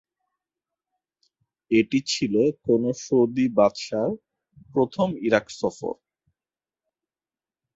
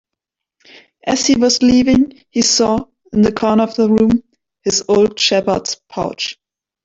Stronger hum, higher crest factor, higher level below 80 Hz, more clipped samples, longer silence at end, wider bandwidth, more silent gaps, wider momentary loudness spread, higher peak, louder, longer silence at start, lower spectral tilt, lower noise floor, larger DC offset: neither; first, 22 dB vs 14 dB; second, -62 dBFS vs -44 dBFS; neither; first, 1.8 s vs 0.5 s; about the same, 8 kHz vs 8 kHz; neither; about the same, 9 LU vs 11 LU; about the same, -4 dBFS vs -2 dBFS; second, -24 LUFS vs -15 LUFS; first, 1.7 s vs 1.05 s; first, -5.5 dB/octave vs -3.5 dB/octave; first, under -90 dBFS vs -82 dBFS; neither